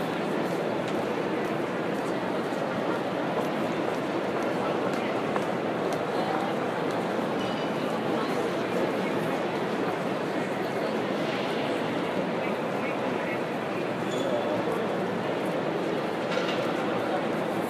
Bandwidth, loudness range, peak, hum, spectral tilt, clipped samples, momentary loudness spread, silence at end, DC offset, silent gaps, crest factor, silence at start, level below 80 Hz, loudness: 15.5 kHz; 1 LU; -12 dBFS; none; -6 dB/octave; under 0.1%; 2 LU; 0 s; under 0.1%; none; 16 dB; 0 s; -68 dBFS; -29 LUFS